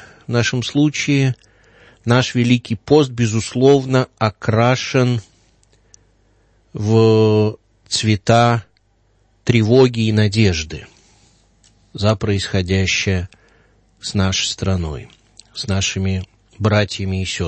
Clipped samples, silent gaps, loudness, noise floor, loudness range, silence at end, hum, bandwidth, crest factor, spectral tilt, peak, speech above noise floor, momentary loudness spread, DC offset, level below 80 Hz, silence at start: under 0.1%; none; -17 LUFS; -59 dBFS; 5 LU; 0 s; none; 8.8 kHz; 18 dB; -5.5 dB/octave; 0 dBFS; 43 dB; 12 LU; under 0.1%; -44 dBFS; 0 s